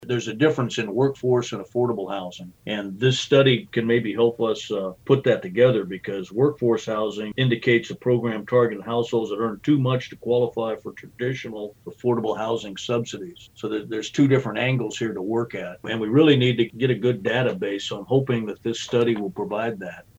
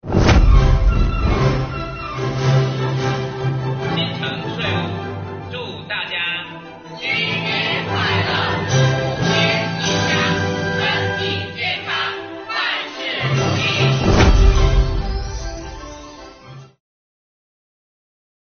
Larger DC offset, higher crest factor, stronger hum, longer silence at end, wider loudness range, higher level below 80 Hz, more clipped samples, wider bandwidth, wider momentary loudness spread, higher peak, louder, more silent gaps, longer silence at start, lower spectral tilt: neither; about the same, 18 dB vs 18 dB; neither; second, 0.15 s vs 1.85 s; about the same, 4 LU vs 6 LU; second, -62 dBFS vs -24 dBFS; neither; first, 8.2 kHz vs 6.6 kHz; second, 11 LU vs 14 LU; about the same, -4 dBFS vs -2 dBFS; second, -23 LUFS vs -19 LUFS; neither; about the same, 0 s vs 0.05 s; first, -6 dB/octave vs -4 dB/octave